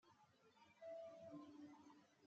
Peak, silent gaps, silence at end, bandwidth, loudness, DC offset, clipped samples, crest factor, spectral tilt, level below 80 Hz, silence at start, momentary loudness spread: -48 dBFS; none; 0 s; 7.6 kHz; -60 LUFS; under 0.1%; under 0.1%; 14 dB; -5 dB/octave; under -90 dBFS; 0.05 s; 9 LU